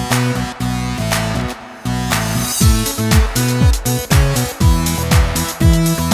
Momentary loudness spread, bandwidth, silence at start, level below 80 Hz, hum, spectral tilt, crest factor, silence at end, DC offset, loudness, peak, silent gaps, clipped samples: 7 LU; 16 kHz; 0 s; -20 dBFS; none; -4.5 dB/octave; 14 dB; 0 s; under 0.1%; -16 LUFS; 0 dBFS; none; under 0.1%